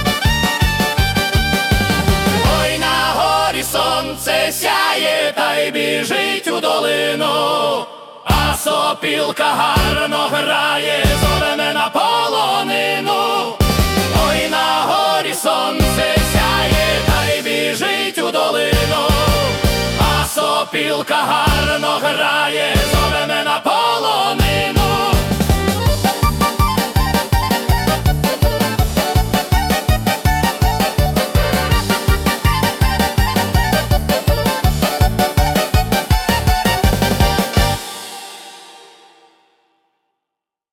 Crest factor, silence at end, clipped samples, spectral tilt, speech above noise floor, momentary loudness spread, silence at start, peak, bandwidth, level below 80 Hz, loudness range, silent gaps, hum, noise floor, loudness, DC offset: 14 dB; 1.95 s; under 0.1%; -4 dB/octave; 66 dB; 2 LU; 0 s; -2 dBFS; 18 kHz; -24 dBFS; 1 LU; none; none; -82 dBFS; -15 LUFS; under 0.1%